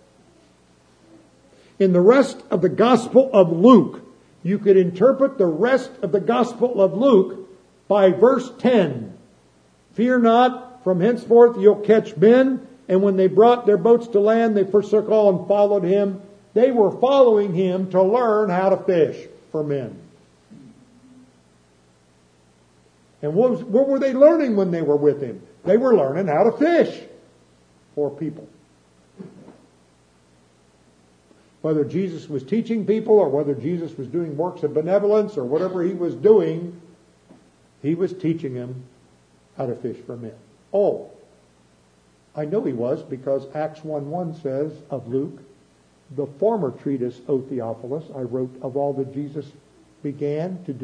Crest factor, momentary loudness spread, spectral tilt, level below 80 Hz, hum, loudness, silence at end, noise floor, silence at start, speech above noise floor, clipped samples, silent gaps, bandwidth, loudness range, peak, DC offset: 20 dB; 16 LU; -8 dB/octave; -68 dBFS; 60 Hz at -55 dBFS; -19 LUFS; 0 s; -57 dBFS; 1.8 s; 39 dB; under 0.1%; none; 9.8 kHz; 12 LU; 0 dBFS; under 0.1%